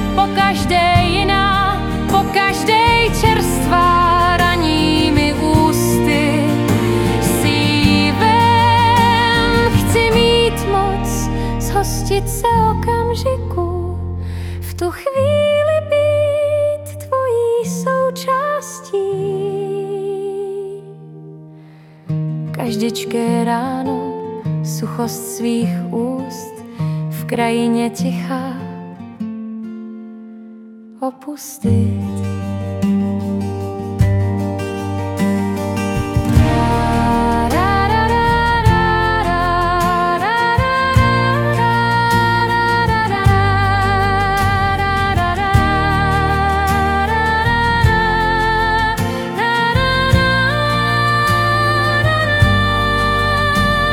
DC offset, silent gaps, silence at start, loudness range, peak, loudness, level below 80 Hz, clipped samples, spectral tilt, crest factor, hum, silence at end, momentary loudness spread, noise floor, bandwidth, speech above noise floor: under 0.1%; none; 0 s; 8 LU; 0 dBFS; -15 LUFS; -28 dBFS; under 0.1%; -5.5 dB/octave; 16 dB; none; 0 s; 10 LU; -40 dBFS; 17 kHz; 22 dB